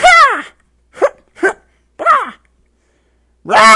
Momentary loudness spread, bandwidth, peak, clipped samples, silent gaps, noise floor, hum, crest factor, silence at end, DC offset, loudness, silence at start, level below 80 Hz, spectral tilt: 18 LU; 12 kHz; 0 dBFS; 0.3%; none; -57 dBFS; none; 12 dB; 0 s; under 0.1%; -12 LUFS; 0 s; -46 dBFS; -1.5 dB/octave